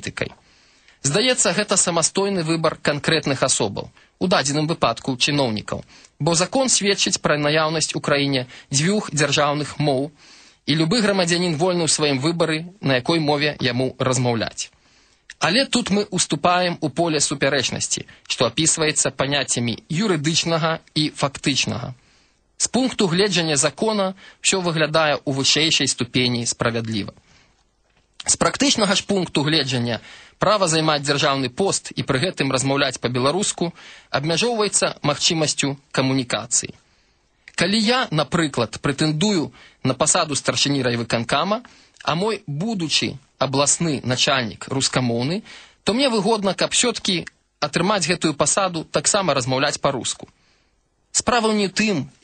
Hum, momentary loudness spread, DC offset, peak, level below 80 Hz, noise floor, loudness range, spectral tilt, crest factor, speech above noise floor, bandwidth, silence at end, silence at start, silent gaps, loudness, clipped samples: none; 8 LU; under 0.1%; -4 dBFS; -54 dBFS; -65 dBFS; 2 LU; -3.5 dB/octave; 18 dB; 44 dB; 9.4 kHz; 0.15 s; 0 s; none; -20 LUFS; under 0.1%